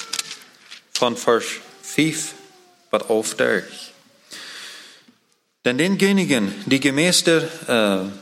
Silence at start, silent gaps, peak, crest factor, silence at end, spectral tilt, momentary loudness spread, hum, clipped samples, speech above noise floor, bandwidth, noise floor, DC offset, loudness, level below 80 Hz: 0 s; none; -2 dBFS; 20 dB; 0 s; -3.5 dB/octave; 20 LU; none; under 0.1%; 45 dB; 16.5 kHz; -65 dBFS; under 0.1%; -20 LUFS; -66 dBFS